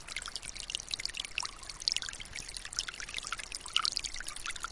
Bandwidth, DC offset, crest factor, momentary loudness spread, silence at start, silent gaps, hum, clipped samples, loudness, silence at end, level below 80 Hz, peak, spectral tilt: 11.5 kHz; under 0.1%; 30 dB; 9 LU; 0 s; none; none; under 0.1%; -36 LUFS; 0 s; -54 dBFS; -8 dBFS; 1 dB/octave